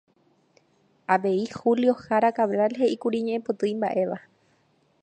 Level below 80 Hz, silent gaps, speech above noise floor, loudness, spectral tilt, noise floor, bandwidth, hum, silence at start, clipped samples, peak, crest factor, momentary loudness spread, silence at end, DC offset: -72 dBFS; none; 42 dB; -24 LUFS; -6.5 dB/octave; -65 dBFS; 9 kHz; none; 1.1 s; under 0.1%; -6 dBFS; 20 dB; 6 LU; 0.85 s; under 0.1%